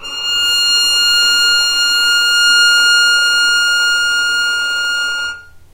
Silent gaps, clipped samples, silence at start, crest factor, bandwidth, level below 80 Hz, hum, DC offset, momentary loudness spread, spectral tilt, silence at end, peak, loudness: none; under 0.1%; 0 s; 12 dB; 16 kHz; -46 dBFS; none; under 0.1%; 7 LU; 3 dB/octave; 0.15 s; -2 dBFS; -10 LUFS